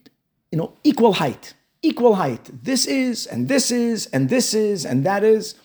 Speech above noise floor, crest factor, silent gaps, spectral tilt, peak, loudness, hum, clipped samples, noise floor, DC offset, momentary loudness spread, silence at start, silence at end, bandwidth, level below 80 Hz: 38 dB; 16 dB; none; -4.5 dB/octave; -4 dBFS; -20 LUFS; none; under 0.1%; -57 dBFS; under 0.1%; 9 LU; 0.5 s; 0.1 s; over 20 kHz; -66 dBFS